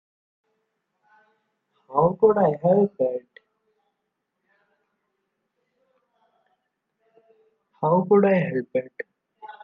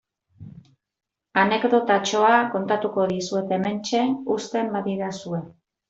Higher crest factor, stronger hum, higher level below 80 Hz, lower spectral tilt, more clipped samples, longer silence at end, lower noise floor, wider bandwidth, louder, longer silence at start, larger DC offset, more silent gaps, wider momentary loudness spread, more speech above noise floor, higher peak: about the same, 20 dB vs 20 dB; neither; about the same, -68 dBFS vs -66 dBFS; first, -11 dB/octave vs -5 dB/octave; neither; second, 0.1 s vs 0.4 s; first, -79 dBFS vs -49 dBFS; second, 4 kHz vs 8 kHz; about the same, -21 LUFS vs -23 LUFS; first, 1.9 s vs 0.4 s; neither; neither; first, 16 LU vs 10 LU; first, 59 dB vs 27 dB; about the same, -6 dBFS vs -4 dBFS